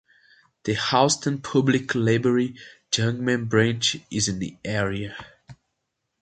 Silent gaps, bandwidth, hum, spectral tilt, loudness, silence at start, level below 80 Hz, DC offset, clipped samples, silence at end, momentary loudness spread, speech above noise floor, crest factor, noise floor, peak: none; 9.4 kHz; none; -4.5 dB/octave; -23 LUFS; 0.65 s; -54 dBFS; under 0.1%; under 0.1%; 0.7 s; 10 LU; 56 dB; 22 dB; -79 dBFS; -4 dBFS